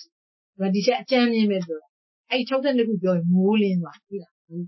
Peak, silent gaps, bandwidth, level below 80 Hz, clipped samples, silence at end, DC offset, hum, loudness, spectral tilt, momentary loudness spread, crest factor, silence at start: -6 dBFS; 0.12-0.53 s, 1.89-2.24 s, 4.31-4.48 s; 6 kHz; -74 dBFS; under 0.1%; 0 s; under 0.1%; none; -22 LUFS; -7 dB/octave; 16 LU; 16 dB; 0 s